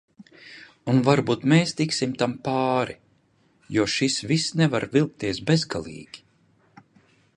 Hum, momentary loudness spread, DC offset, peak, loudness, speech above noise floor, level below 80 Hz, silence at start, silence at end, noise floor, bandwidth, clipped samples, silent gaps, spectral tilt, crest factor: none; 20 LU; under 0.1%; -4 dBFS; -23 LUFS; 40 dB; -58 dBFS; 0.2 s; 1.2 s; -63 dBFS; 11 kHz; under 0.1%; none; -5.5 dB/octave; 22 dB